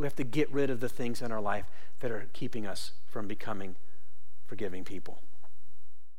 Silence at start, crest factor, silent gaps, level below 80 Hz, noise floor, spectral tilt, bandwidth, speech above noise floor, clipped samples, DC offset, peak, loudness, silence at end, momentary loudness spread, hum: 0 s; 18 dB; none; -62 dBFS; -66 dBFS; -6 dB/octave; 16.5 kHz; 30 dB; under 0.1%; 6%; -14 dBFS; -37 LUFS; 0 s; 16 LU; none